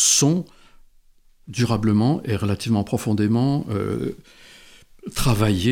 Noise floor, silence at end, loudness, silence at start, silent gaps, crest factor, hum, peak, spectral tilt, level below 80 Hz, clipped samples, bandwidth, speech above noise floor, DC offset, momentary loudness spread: -54 dBFS; 0 s; -21 LUFS; 0 s; none; 18 dB; none; -4 dBFS; -4.5 dB/octave; -42 dBFS; under 0.1%; 17.5 kHz; 33 dB; under 0.1%; 13 LU